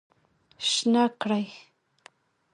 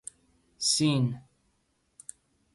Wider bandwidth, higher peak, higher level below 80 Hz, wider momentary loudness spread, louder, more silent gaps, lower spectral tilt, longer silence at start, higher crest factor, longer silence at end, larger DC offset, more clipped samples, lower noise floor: about the same, 11.5 kHz vs 11.5 kHz; about the same, -10 dBFS vs -12 dBFS; second, -76 dBFS vs -66 dBFS; second, 7 LU vs 22 LU; about the same, -25 LUFS vs -27 LUFS; neither; about the same, -3.5 dB/octave vs -4 dB/octave; about the same, 0.6 s vs 0.6 s; about the same, 18 dB vs 20 dB; second, 0.95 s vs 1.35 s; neither; neither; second, -63 dBFS vs -73 dBFS